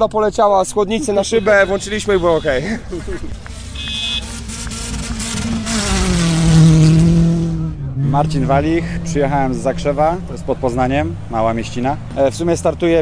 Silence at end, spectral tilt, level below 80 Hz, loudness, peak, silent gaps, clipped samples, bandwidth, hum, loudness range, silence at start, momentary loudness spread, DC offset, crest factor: 0 s; -5.5 dB/octave; -28 dBFS; -16 LUFS; 0 dBFS; none; under 0.1%; 10.5 kHz; none; 7 LU; 0 s; 12 LU; under 0.1%; 16 dB